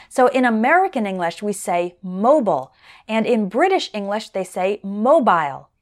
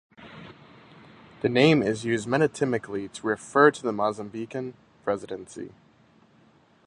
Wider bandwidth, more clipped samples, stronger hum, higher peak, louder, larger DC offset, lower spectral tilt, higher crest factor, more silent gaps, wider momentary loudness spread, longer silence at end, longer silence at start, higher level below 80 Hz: first, 13.5 kHz vs 10.5 kHz; neither; neither; about the same, -4 dBFS vs -4 dBFS; first, -19 LUFS vs -25 LUFS; neither; about the same, -5 dB/octave vs -5.5 dB/octave; second, 16 dB vs 24 dB; neither; second, 10 LU vs 21 LU; second, 0.2 s vs 1.2 s; about the same, 0.1 s vs 0.2 s; about the same, -66 dBFS vs -64 dBFS